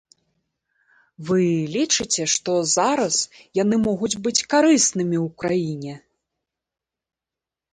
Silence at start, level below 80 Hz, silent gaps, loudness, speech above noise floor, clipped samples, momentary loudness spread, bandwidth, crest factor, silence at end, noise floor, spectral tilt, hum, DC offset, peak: 1.2 s; -60 dBFS; none; -20 LUFS; 68 dB; under 0.1%; 8 LU; 10 kHz; 18 dB; 1.75 s; -88 dBFS; -3.5 dB/octave; none; under 0.1%; -6 dBFS